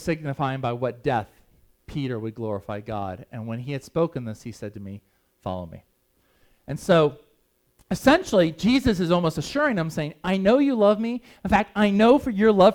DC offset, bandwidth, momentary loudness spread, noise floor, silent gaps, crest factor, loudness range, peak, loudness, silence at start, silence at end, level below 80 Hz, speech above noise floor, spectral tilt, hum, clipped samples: under 0.1%; 17.5 kHz; 17 LU; -66 dBFS; none; 20 dB; 11 LU; -2 dBFS; -23 LUFS; 0 s; 0 s; -48 dBFS; 44 dB; -6.5 dB/octave; none; under 0.1%